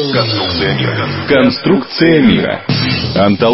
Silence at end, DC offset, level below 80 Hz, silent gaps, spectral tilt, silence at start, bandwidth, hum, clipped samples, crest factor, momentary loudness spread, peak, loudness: 0 s; under 0.1%; -38 dBFS; none; -9 dB/octave; 0 s; 6 kHz; none; under 0.1%; 12 dB; 6 LU; 0 dBFS; -12 LUFS